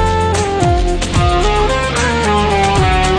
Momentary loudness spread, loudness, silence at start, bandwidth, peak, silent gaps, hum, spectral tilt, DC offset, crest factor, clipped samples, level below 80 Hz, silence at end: 2 LU; -14 LUFS; 0 s; 10.5 kHz; 0 dBFS; none; none; -5 dB/octave; under 0.1%; 12 dB; under 0.1%; -20 dBFS; 0 s